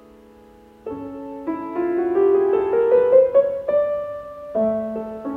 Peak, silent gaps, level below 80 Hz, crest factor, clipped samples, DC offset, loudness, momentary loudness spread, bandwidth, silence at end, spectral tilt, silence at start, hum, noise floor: -4 dBFS; none; -56 dBFS; 16 dB; under 0.1%; under 0.1%; -19 LUFS; 18 LU; 3.8 kHz; 0 s; -8.5 dB/octave; 0.85 s; none; -47 dBFS